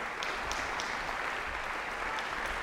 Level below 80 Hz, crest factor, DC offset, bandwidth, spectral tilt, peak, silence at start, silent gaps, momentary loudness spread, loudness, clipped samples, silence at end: -50 dBFS; 20 dB; under 0.1%; 16 kHz; -2 dB/octave; -16 dBFS; 0 s; none; 2 LU; -35 LUFS; under 0.1%; 0 s